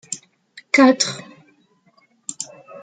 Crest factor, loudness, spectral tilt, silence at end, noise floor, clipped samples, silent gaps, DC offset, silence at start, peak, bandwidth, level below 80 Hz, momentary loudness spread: 20 dB; -17 LUFS; -2.5 dB/octave; 0.05 s; -59 dBFS; under 0.1%; none; under 0.1%; 0.1 s; -2 dBFS; 9.4 kHz; -72 dBFS; 20 LU